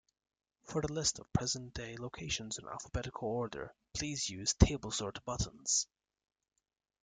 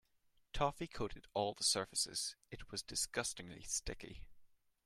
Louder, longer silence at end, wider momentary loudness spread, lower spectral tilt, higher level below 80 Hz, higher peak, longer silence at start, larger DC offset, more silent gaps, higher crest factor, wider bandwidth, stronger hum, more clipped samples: first, -36 LUFS vs -40 LUFS; first, 1.2 s vs 0.4 s; second, 13 LU vs 16 LU; first, -3.5 dB/octave vs -2 dB/octave; first, -48 dBFS vs -58 dBFS; first, -10 dBFS vs -20 dBFS; about the same, 0.65 s vs 0.55 s; neither; neither; about the same, 26 dB vs 22 dB; second, 10 kHz vs 16 kHz; neither; neither